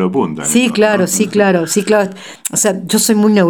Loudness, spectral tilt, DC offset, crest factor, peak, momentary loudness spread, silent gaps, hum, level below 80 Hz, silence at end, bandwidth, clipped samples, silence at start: -13 LUFS; -4 dB/octave; 0.2%; 12 dB; 0 dBFS; 5 LU; none; none; -60 dBFS; 0 s; 17.5 kHz; under 0.1%; 0 s